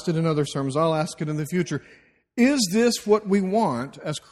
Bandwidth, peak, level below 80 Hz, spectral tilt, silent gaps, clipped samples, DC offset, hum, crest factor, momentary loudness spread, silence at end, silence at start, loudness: 15.5 kHz; -6 dBFS; -60 dBFS; -5.5 dB/octave; none; under 0.1%; under 0.1%; none; 16 dB; 10 LU; 0.1 s; 0 s; -23 LUFS